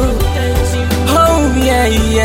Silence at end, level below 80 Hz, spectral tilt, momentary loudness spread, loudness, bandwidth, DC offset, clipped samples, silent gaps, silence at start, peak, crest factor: 0 s; -18 dBFS; -5 dB/octave; 5 LU; -12 LUFS; 16.5 kHz; under 0.1%; under 0.1%; none; 0 s; 0 dBFS; 12 dB